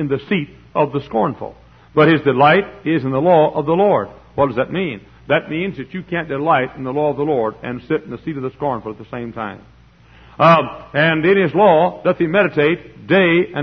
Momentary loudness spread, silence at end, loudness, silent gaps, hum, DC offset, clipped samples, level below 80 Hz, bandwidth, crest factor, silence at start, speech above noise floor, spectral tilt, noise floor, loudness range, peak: 14 LU; 0 s; -17 LUFS; none; none; under 0.1%; under 0.1%; -50 dBFS; 6.2 kHz; 16 dB; 0 s; 30 dB; -8.5 dB/octave; -46 dBFS; 6 LU; 0 dBFS